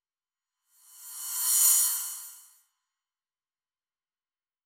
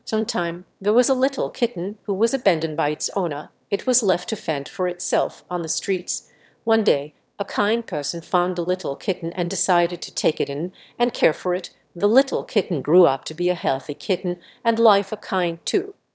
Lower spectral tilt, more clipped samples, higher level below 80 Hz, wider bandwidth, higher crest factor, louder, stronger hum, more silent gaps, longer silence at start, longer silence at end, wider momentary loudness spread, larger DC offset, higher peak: second, 9.5 dB/octave vs -4 dB/octave; neither; second, under -90 dBFS vs -72 dBFS; first, over 20 kHz vs 8 kHz; about the same, 24 dB vs 20 dB; about the same, -23 LUFS vs -22 LUFS; neither; neither; first, 1 s vs 0.05 s; first, 2.25 s vs 0.25 s; first, 22 LU vs 9 LU; neither; second, -10 dBFS vs -2 dBFS